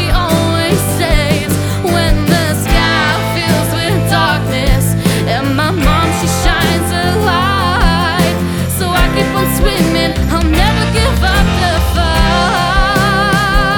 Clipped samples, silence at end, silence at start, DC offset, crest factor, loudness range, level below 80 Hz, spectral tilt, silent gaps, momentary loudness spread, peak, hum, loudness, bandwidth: under 0.1%; 0 s; 0 s; under 0.1%; 12 dB; 1 LU; -18 dBFS; -5 dB/octave; none; 2 LU; 0 dBFS; none; -12 LUFS; over 20 kHz